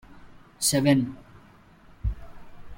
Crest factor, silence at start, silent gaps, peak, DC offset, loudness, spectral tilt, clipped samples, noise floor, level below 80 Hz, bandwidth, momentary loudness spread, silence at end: 20 dB; 0.1 s; none; -8 dBFS; under 0.1%; -25 LUFS; -4.5 dB/octave; under 0.1%; -53 dBFS; -40 dBFS; 16.5 kHz; 20 LU; 0.05 s